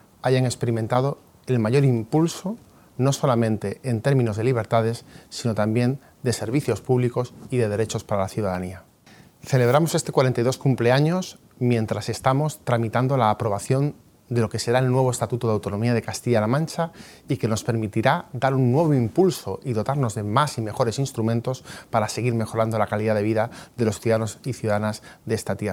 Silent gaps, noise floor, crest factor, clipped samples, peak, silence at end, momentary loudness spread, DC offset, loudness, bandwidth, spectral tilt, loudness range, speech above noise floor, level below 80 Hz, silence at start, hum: none; -51 dBFS; 20 dB; under 0.1%; -4 dBFS; 0 s; 9 LU; under 0.1%; -23 LUFS; 16.5 kHz; -6.5 dB/octave; 2 LU; 29 dB; -60 dBFS; 0.25 s; none